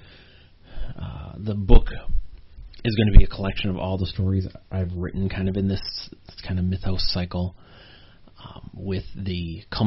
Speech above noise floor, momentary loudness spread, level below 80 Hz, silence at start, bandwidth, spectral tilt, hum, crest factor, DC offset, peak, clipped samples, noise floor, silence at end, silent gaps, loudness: 30 dB; 18 LU; -24 dBFS; 0.7 s; 5.8 kHz; -6 dB/octave; none; 20 dB; under 0.1%; 0 dBFS; under 0.1%; -50 dBFS; 0 s; none; -26 LUFS